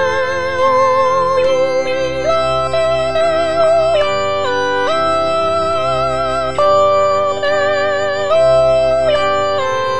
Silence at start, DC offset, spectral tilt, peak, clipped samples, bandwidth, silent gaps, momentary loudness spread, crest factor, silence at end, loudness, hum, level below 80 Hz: 0 s; 4%; -4 dB/octave; -2 dBFS; under 0.1%; 10 kHz; none; 5 LU; 12 dB; 0 s; -14 LUFS; none; -40 dBFS